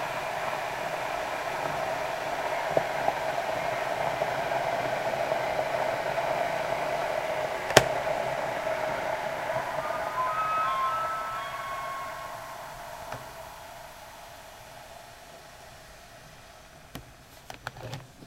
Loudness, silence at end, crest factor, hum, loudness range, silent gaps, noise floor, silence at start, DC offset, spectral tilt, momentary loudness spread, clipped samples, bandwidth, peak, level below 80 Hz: -30 LUFS; 0 s; 32 dB; none; 18 LU; none; -50 dBFS; 0 s; under 0.1%; -3 dB/octave; 19 LU; under 0.1%; 16 kHz; 0 dBFS; -58 dBFS